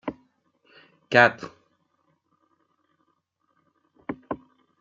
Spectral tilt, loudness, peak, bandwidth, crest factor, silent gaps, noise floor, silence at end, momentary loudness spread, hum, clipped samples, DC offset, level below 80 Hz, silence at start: -5.5 dB/octave; -22 LUFS; -4 dBFS; 7.6 kHz; 26 dB; none; -72 dBFS; 0.45 s; 23 LU; none; under 0.1%; under 0.1%; -68 dBFS; 0.05 s